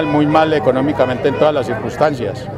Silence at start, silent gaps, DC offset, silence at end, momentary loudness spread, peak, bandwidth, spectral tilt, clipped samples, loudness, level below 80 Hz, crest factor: 0 s; none; under 0.1%; 0 s; 6 LU; 0 dBFS; 12 kHz; -7 dB/octave; under 0.1%; -15 LUFS; -44 dBFS; 14 dB